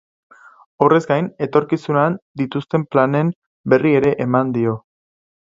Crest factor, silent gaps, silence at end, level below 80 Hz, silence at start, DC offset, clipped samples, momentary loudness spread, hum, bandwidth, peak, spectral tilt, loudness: 18 dB; 2.22-2.34 s, 3.36-3.64 s; 0.8 s; -58 dBFS; 0.8 s; under 0.1%; under 0.1%; 9 LU; none; 7.8 kHz; 0 dBFS; -8.5 dB/octave; -18 LUFS